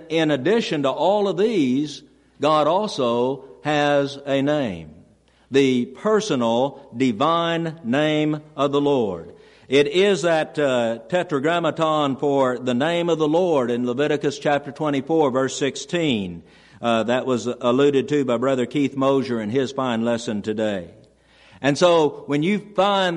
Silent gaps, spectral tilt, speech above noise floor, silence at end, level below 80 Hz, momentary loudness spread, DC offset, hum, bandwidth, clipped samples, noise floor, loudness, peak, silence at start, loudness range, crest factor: none; -5.5 dB/octave; 34 dB; 0 s; -62 dBFS; 6 LU; under 0.1%; none; 11 kHz; under 0.1%; -55 dBFS; -21 LUFS; -4 dBFS; 0 s; 2 LU; 16 dB